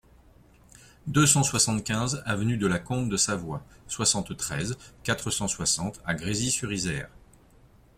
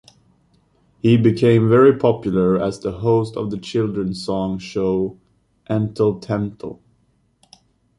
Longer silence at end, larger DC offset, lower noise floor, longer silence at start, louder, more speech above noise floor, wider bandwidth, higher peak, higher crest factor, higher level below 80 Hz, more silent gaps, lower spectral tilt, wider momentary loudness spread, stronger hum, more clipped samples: second, 0.9 s vs 1.25 s; neither; second, -56 dBFS vs -62 dBFS; about the same, 1.05 s vs 1.05 s; second, -26 LUFS vs -19 LUFS; second, 29 dB vs 44 dB; first, 16 kHz vs 11.5 kHz; about the same, -4 dBFS vs -2 dBFS; first, 24 dB vs 18 dB; about the same, -52 dBFS vs -50 dBFS; neither; second, -3.5 dB/octave vs -8 dB/octave; about the same, 13 LU vs 11 LU; neither; neither